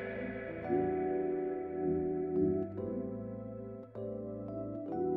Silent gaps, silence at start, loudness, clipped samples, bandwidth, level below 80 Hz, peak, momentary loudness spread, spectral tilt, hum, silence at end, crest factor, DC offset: none; 0 s; -37 LUFS; under 0.1%; 3.7 kHz; -62 dBFS; -20 dBFS; 11 LU; -11.5 dB/octave; none; 0 s; 16 dB; under 0.1%